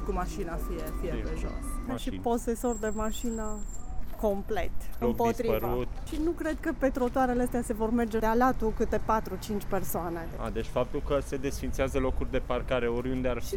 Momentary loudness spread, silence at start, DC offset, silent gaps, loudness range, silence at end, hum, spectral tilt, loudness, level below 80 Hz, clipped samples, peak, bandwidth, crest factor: 9 LU; 0 s; under 0.1%; none; 5 LU; 0 s; none; -6 dB/octave; -31 LUFS; -36 dBFS; under 0.1%; -12 dBFS; 17.5 kHz; 16 dB